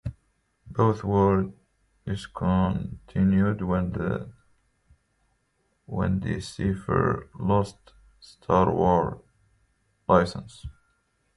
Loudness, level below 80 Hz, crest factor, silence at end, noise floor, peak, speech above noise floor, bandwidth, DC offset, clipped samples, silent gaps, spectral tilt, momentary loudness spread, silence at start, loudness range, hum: -25 LUFS; -44 dBFS; 22 dB; 0.65 s; -72 dBFS; -6 dBFS; 47 dB; 11.5 kHz; under 0.1%; under 0.1%; none; -8 dB/octave; 17 LU; 0.05 s; 5 LU; none